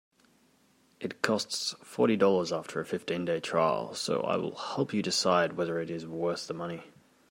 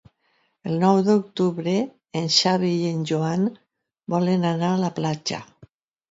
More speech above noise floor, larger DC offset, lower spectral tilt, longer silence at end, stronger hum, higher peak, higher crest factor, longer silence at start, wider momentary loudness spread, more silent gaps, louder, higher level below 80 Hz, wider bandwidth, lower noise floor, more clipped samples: second, 36 dB vs 46 dB; neither; second, -4 dB/octave vs -5.5 dB/octave; second, 0.4 s vs 0.65 s; neither; second, -8 dBFS vs -4 dBFS; about the same, 22 dB vs 20 dB; first, 1 s vs 0.65 s; about the same, 11 LU vs 11 LU; neither; second, -30 LUFS vs -22 LUFS; second, -76 dBFS vs -66 dBFS; first, 16 kHz vs 7.8 kHz; about the same, -66 dBFS vs -68 dBFS; neither